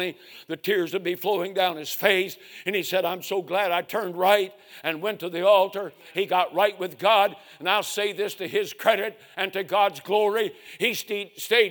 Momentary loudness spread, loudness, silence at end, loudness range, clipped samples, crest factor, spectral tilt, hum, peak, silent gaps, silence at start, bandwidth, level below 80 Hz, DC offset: 10 LU; -25 LUFS; 0 s; 2 LU; under 0.1%; 22 dB; -3 dB/octave; none; -4 dBFS; none; 0 s; 19.5 kHz; -80 dBFS; under 0.1%